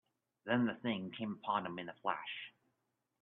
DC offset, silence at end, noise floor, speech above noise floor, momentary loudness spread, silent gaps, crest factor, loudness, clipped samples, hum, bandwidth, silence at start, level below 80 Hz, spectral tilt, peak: under 0.1%; 0.75 s; -85 dBFS; 46 dB; 12 LU; none; 22 dB; -39 LUFS; under 0.1%; none; 4.1 kHz; 0.45 s; -84 dBFS; -3.5 dB/octave; -18 dBFS